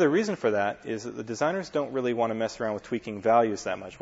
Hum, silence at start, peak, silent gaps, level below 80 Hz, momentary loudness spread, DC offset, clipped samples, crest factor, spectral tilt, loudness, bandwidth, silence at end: none; 0 s; -8 dBFS; none; -64 dBFS; 11 LU; under 0.1%; under 0.1%; 18 dB; -5.5 dB/octave; -28 LUFS; 8 kHz; 0.05 s